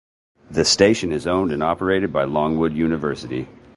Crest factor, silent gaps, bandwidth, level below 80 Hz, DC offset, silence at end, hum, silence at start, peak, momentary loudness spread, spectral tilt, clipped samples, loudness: 20 dB; none; 11.5 kHz; -44 dBFS; under 0.1%; 0.25 s; none; 0.5 s; -2 dBFS; 11 LU; -4.5 dB/octave; under 0.1%; -20 LUFS